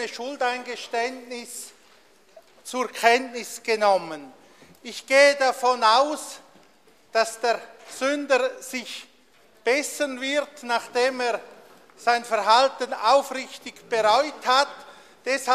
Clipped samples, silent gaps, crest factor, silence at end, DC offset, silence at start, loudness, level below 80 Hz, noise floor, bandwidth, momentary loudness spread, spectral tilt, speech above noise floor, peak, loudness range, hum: under 0.1%; none; 22 dB; 0 s; under 0.1%; 0 s; -23 LUFS; -74 dBFS; -58 dBFS; 15 kHz; 18 LU; -1 dB/octave; 34 dB; -2 dBFS; 5 LU; none